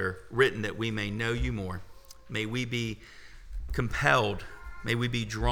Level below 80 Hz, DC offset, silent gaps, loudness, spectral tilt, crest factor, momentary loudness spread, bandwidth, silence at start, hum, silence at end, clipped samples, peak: -42 dBFS; under 0.1%; none; -30 LUFS; -5.5 dB/octave; 24 dB; 18 LU; 18.5 kHz; 0 s; none; 0 s; under 0.1%; -8 dBFS